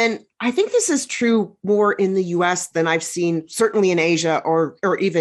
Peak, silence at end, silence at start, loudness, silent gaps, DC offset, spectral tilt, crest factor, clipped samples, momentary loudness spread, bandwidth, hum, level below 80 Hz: -4 dBFS; 0 s; 0 s; -19 LUFS; none; under 0.1%; -4 dB/octave; 14 dB; under 0.1%; 4 LU; 12.5 kHz; none; -68 dBFS